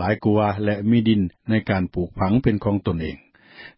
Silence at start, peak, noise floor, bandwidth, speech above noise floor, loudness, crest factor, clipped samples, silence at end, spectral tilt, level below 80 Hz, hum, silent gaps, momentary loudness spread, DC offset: 0 s; -4 dBFS; -45 dBFS; 5.6 kHz; 25 dB; -21 LUFS; 16 dB; under 0.1%; 0.1 s; -12.5 dB/octave; -40 dBFS; none; none; 8 LU; under 0.1%